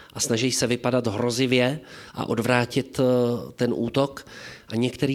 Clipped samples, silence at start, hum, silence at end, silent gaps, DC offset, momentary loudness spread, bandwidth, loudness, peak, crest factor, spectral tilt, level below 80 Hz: under 0.1%; 0 s; none; 0 s; none; under 0.1%; 12 LU; 15.5 kHz; -24 LUFS; -6 dBFS; 18 dB; -4.5 dB/octave; -58 dBFS